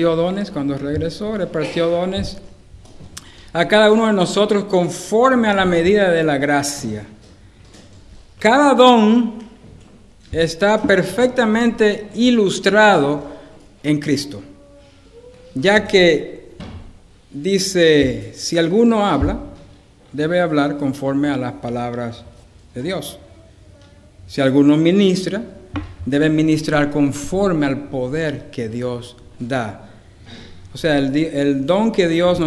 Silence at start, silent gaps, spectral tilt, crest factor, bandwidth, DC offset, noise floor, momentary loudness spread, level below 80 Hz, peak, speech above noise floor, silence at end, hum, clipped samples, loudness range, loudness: 0 s; none; -5.5 dB/octave; 18 dB; 12 kHz; under 0.1%; -45 dBFS; 17 LU; -42 dBFS; 0 dBFS; 29 dB; 0 s; none; under 0.1%; 7 LU; -17 LUFS